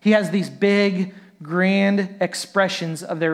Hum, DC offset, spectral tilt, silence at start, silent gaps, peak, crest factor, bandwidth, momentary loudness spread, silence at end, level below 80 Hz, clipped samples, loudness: none; under 0.1%; -5.5 dB/octave; 0.05 s; none; -4 dBFS; 16 dB; 13.5 kHz; 9 LU; 0 s; -74 dBFS; under 0.1%; -21 LUFS